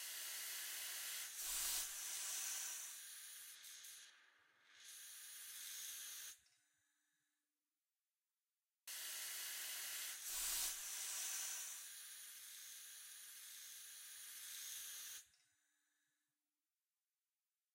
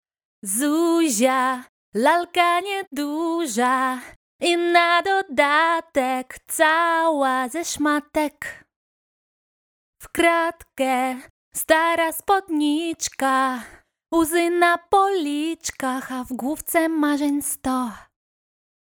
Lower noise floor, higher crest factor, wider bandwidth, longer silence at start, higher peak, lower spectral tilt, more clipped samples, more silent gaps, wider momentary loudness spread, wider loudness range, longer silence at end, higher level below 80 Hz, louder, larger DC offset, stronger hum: about the same, under -90 dBFS vs under -90 dBFS; about the same, 22 dB vs 20 dB; second, 16 kHz vs over 20 kHz; second, 0 s vs 0.45 s; second, -30 dBFS vs -2 dBFS; second, 3.5 dB/octave vs -2 dB/octave; neither; second, none vs 1.69-1.92 s, 2.87-2.91 s, 4.16-4.39 s, 8.76-9.93 s, 11.30-11.52 s; first, 13 LU vs 10 LU; first, 10 LU vs 5 LU; first, 2.45 s vs 0.95 s; second, -80 dBFS vs -58 dBFS; second, -47 LUFS vs -21 LUFS; neither; neither